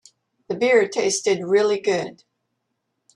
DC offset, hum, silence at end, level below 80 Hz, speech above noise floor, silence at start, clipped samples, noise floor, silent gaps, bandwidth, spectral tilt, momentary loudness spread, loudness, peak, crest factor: under 0.1%; none; 1.05 s; -70 dBFS; 56 dB; 0.5 s; under 0.1%; -76 dBFS; none; 11.5 kHz; -3 dB/octave; 9 LU; -20 LUFS; -4 dBFS; 18 dB